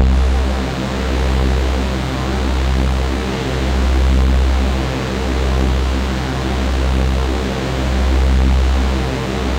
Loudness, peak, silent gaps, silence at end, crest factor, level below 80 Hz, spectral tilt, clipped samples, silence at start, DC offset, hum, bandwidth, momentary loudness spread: -17 LUFS; -4 dBFS; none; 0 s; 12 dB; -16 dBFS; -6 dB/octave; under 0.1%; 0 s; under 0.1%; none; 9.8 kHz; 5 LU